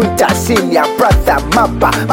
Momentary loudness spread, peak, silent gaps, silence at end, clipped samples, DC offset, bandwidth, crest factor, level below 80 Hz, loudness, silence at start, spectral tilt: 2 LU; 0 dBFS; none; 0 s; under 0.1%; under 0.1%; 17 kHz; 12 dB; -22 dBFS; -12 LUFS; 0 s; -5 dB/octave